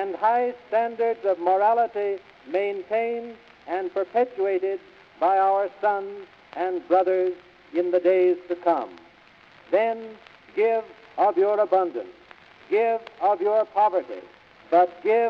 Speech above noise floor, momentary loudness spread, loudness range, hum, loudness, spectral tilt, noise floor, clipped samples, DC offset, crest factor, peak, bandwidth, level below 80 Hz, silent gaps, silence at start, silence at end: 30 dB; 14 LU; 2 LU; none; -24 LUFS; -6.5 dB/octave; -53 dBFS; under 0.1%; under 0.1%; 16 dB; -8 dBFS; 6 kHz; -72 dBFS; none; 0 s; 0 s